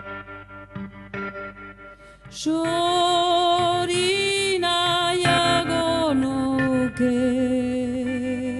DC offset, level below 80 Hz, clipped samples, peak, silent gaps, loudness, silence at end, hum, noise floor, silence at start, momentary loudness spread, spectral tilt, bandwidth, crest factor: under 0.1%; -50 dBFS; under 0.1%; -6 dBFS; none; -21 LUFS; 0 s; none; -45 dBFS; 0 s; 18 LU; -4 dB/octave; 11.5 kHz; 16 dB